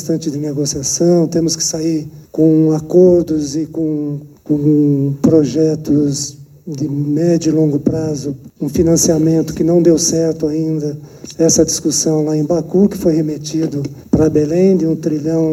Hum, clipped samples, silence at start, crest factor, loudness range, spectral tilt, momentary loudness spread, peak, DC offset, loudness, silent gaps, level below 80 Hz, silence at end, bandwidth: none; under 0.1%; 0 s; 14 dB; 2 LU; -6 dB/octave; 10 LU; 0 dBFS; under 0.1%; -14 LUFS; none; -42 dBFS; 0 s; 16 kHz